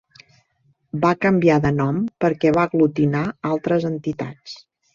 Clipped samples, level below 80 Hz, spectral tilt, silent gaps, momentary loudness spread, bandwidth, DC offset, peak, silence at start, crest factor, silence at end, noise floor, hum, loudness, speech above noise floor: under 0.1%; -52 dBFS; -8 dB/octave; none; 15 LU; 7.4 kHz; under 0.1%; -4 dBFS; 0.95 s; 18 dB; 0.4 s; -63 dBFS; none; -20 LUFS; 44 dB